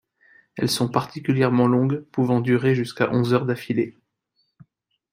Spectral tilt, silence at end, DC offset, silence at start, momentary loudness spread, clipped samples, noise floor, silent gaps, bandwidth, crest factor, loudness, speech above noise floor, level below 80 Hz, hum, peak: -6.5 dB/octave; 1.25 s; under 0.1%; 0.55 s; 7 LU; under 0.1%; -71 dBFS; none; 16 kHz; 18 dB; -22 LUFS; 51 dB; -62 dBFS; none; -4 dBFS